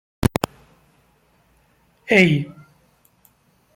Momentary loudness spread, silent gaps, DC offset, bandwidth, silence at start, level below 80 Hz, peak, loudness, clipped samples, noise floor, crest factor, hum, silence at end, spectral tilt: 19 LU; none; under 0.1%; 16.5 kHz; 0.2 s; -44 dBFS; 0 dBFS; -19 LUFS; under 0.1%; -60 dBFS; 24 dB; none; 1.25 s; -6 dB/octave